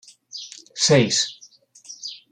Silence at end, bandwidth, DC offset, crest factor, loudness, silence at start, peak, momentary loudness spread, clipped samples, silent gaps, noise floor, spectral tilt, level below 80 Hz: 0.15 s; 11 kHz; under 0.1%; 20 dB; -19 LUFS; 0.35 s; -4 dBFS; 20 LU; under 0.1%; none; -51 dBFS; -3.5 dB/octave; -64 dBFS